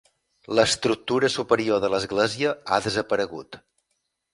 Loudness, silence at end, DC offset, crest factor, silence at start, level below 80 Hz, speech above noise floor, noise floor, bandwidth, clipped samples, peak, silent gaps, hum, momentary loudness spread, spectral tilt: -23 LUFS; 0.75 s; under 0.1%; 20 dB; 0.5 s; -58 dBFS; 53 dB; -76 dBFS; 11.5 kHz; under 0.1%; -4 dBFS; none; none; 5 LU; -3.5 dB/octave